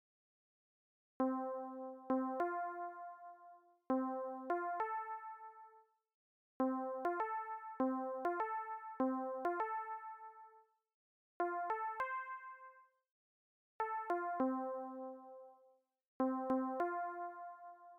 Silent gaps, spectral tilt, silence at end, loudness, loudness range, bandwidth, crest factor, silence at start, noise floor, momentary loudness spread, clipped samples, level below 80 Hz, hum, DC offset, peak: 6.14-6.60 s, 10.94-11.40 s, 13.11-13.79 s, 16.08-16.20 s; -7 dB/octave; 0 s; -41 LUFS; 4 LU; 4.7 kHz; 12 dB; 1.2 s; -72 dBFS; 16 LU; under 0.1%; -86 dBFS; none; under 0.1%; -30 dBFS